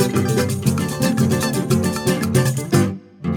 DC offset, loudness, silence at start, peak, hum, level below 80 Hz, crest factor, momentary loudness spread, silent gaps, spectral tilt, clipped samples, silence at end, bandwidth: under 0.1%; -19 LUFS; 0 s; -2 dBFS; none; -46 dBFS; 16 dB; 2 LU; none; -5.5 dB/octave; under 0.1%; 0 s; 19.5 kHz